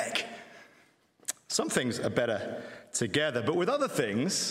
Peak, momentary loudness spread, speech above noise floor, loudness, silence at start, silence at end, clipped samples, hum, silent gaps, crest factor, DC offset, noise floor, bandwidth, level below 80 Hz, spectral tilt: -10 dBFS; 12 LU; 34 dB; -30 LUFS; 0 s; 0 s; under 0.1%; none; none; 22 dB; under 0.1%; -64 dBFS; 16 kHz; -70 dBFS; -3.5 dB/octave